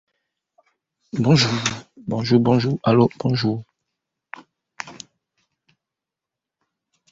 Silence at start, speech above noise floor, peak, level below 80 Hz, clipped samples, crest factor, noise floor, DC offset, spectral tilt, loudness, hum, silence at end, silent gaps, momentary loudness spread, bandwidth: 1.15 s; 68 dB; -2 dBFS; -56 dBFS; under 0.1%; 20 dB; -86 dBFS; under 0.1%; -6 dB/octave; -20 LUFS; none; 2.2 s; none; 24 LU; 8 kHz